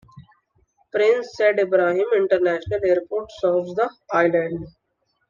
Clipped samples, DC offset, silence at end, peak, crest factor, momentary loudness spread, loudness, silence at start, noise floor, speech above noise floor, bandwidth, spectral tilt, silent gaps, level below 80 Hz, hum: under 0.1%; under 0.1%; 0.6 s; -6 dBFS; 16 dB; 9 LU; -21 LUFS; 0.15 s; -71 dBFS; 51 dB; 7.4 kHz; -6.5 dB/octave; none; -56 dBFS; none